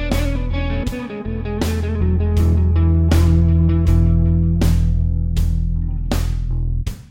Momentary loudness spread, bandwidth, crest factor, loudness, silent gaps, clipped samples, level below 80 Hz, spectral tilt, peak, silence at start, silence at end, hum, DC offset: 9 LU; 16 kHz; 14 dB; -18 LUFS; none; under 0.1%; -20 dBFS; -7.5 dB/octave; -2 dBFS; 0 s; 0 s; none; 0.8%